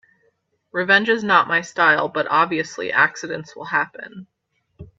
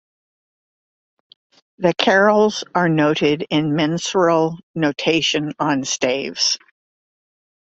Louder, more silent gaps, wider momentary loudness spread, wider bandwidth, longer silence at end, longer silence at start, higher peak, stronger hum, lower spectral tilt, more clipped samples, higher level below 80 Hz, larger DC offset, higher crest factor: about the same, -18 LUFS vs -18 LUFS; second, none vs 4.63-4.74 s; first, 14 LU vs 6 LU; about the same, 7.8 kHz vs 8.2 kHz; second, 0.15 s vs 1.15 s; second, 0.75 s vs 1.8 s; about the same, 0 dBFS vs -2 dBFS; neither; about the same, -4 dB/octave vs -4 dB/octave; neither; about the same, -62 dBFS vs -60 dBFS; neither; about the same, 20 dB vs 18 dB